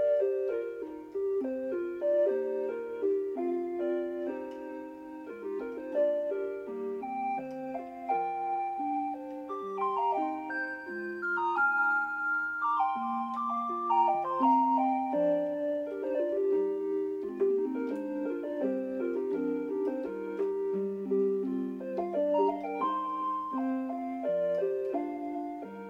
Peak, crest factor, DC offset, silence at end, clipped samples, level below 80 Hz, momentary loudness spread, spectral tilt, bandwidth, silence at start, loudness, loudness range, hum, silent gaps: -16 dBFS; 16 dB; under 0.1%; 0 s; under 0.1%; -74 dBFS; 10 LU; -7.5 dB/octave; 7 kHz; 0 s; -32 LUFS; 6 LU; none; none